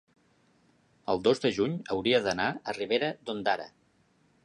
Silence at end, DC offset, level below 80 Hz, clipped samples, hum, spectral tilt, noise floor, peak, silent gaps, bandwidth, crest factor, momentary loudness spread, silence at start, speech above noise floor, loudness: 0.75 s; under 0.1%; -66 dBFS; under 0.1%; none; -5 dB/octave; -67 dBFS; -10 dBFS; none; 11 kHz; 20 dB; 8 LU; 1.1 s; 39 dB; -29 LUFS